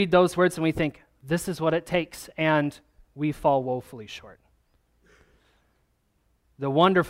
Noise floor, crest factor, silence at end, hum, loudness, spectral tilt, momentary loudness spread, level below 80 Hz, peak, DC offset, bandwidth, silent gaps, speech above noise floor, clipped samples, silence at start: -69 dBFS; 22 dB; 0 s; none; -25 LUFS; -6 dB/octave; 15 LU; -54 dBFS; -4 dBFS; under 0.1%; 16 kHz; none; 45 dB; under 0.1%; 0 s